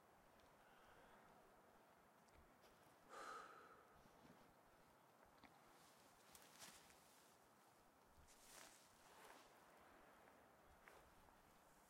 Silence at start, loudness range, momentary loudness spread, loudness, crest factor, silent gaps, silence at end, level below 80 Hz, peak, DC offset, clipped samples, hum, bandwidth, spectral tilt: 0 s; 3 LU; 10 LU; -65 LUFS; 24 dB; none; 0 s; -84 dBFS; -46 dBFS; under 0.1%; under 0.1%; none; 16 kHz; -2.5 dB/octave